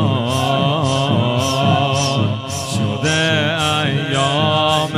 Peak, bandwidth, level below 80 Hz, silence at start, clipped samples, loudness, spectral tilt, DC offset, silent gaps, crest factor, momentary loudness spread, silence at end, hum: -2 dBFS; 15.5 kHz; -52 dBFS; 0 s; under 0.1%; -16 LUFS; -4.5 dB/octave; under 0.1%; none; 14 dB; 5 LU; 0 s; none